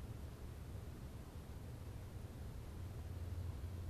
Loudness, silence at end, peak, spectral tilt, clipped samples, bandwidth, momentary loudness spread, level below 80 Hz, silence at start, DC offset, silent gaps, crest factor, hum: -51 LUFS; 0 s; -36 dBFS; -6.5 dB/octave; under 0.1%; 14 kHz; 5 LU; -54 dBFS; 0 s; under 0.1%; none; 12 dB; none